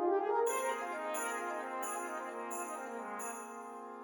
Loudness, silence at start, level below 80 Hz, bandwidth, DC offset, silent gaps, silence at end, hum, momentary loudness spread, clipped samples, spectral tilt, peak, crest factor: -38 LUFS; 0 s; -86 dBFS; 19 kHz; under 0.1%; none; 0 s; none; 11 LU; under 0.1%; -1.5 dB/octave; -22 dBFS; 16 dB